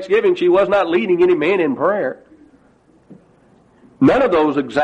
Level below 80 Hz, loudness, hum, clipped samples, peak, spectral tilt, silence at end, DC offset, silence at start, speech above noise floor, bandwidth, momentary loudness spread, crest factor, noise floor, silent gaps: -50 dBFS; -15 LUFS; none; under 0.1%; -2 dBFS; -7 dB/octave; 0 s; under 0.1%; 0 s; 38 dB; 8.2 kHz; 5 LU; 14 dB; -53 dBFS; none